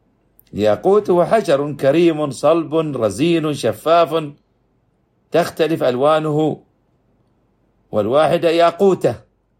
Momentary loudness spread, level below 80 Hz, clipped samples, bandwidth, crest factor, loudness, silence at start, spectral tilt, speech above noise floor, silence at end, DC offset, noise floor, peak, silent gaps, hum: 7 LU; -58 dBFS; under 0.1%; 15.5 kHz; 16 dB; -16 LUFS; 0.55 s; -6 dB/octave; 46 dB; 0.4 s; under 0.1%; -62 dBFS; -2 dBFS; none; none